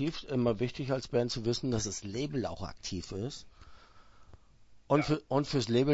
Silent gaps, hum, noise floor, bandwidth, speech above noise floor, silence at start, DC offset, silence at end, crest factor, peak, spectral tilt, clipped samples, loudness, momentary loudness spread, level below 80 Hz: none; none; -57 dBFS; 8 kHz; 25 dB; 0 s; under 0.1%; 0 s; 22 dB; -12 dBFS; -5.5 dB/octave; under 0.1%; -33 LUFS; 10 LU; -54 dBFS